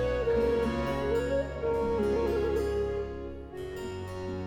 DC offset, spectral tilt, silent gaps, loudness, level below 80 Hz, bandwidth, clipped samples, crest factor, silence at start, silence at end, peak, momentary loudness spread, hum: under 0.1%; -7 dB/octave; none; -30 LUFS; -42 dBFS; 17.5 kHz; under 0.1%; 12 dB; 0 s; 0 s; -18 dBFS; 11 LU; none